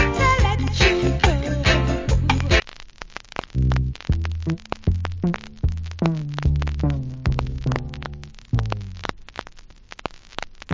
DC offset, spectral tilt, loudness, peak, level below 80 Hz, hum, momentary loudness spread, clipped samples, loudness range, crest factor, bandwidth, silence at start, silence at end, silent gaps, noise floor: under 0.1%; -5.5 dB/octave; -22 LUFS; -2 dBFS; -26 dBFS; none; 17 LU; under 0.1%; 8 LU; 20 dB; 7.6 kHz; 0 s; 0 s; none; -43 dBFS